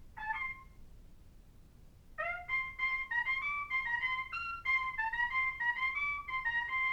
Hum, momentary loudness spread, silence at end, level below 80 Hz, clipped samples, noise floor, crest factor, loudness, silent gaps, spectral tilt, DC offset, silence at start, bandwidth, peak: none; 7 LU; 0 s; -58 dBFS; under 0.1%; -57 dBFS; 14 dB; -34 LUFS; none; -3 dB/octave; under 0.1%; 0 s; 18.5 kHz; -22 dBFS